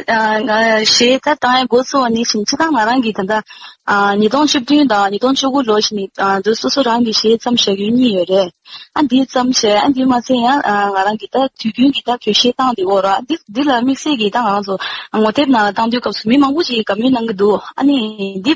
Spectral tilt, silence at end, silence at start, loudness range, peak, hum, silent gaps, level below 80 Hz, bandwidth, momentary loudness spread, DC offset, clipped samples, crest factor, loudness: -3.5 dB/octave; 0 s; 0 s; 1 LU; -2 dBFS; none; none; -54 dBFS; 8 kHz; 6 LU; under 0.1%; under 0.1%; 12 dB; -14 LUFS